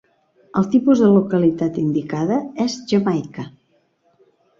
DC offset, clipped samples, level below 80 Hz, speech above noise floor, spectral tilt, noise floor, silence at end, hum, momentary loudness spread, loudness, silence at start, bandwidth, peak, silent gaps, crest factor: under 0.1%; under 0.1%; -58 dBFS; 45 dB; -7.5 dB/octave; -62 dBFS; 1.1 s; none; 11 LU; -18 LUFS; 0.55 s; 7.6 kHz; -4 dBFS; none; 16 dB